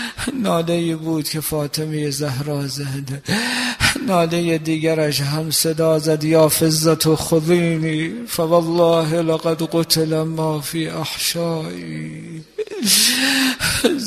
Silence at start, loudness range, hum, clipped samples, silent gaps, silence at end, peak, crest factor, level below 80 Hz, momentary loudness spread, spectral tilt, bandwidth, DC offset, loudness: 0 s; 5 LU; none; under 0.1%; none; 0 s; 0 dBFS; 18 dB; -46 dBFS; 10 LU; -4 dB/octave; 15 kHz; under 0.1%; -18 LUFS